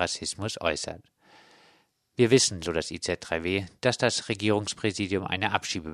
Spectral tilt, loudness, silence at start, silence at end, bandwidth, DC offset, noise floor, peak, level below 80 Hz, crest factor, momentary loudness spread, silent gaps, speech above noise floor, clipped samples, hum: -3.5 dB/octave; -27 LUFS; 0 s; 0 s; 14.5 kHz; under 0.1%; -65 dBFS; -4 dBFS; -56 dBFS; 24 dB; 10 LU; none; 37 dB; under 0.1%; none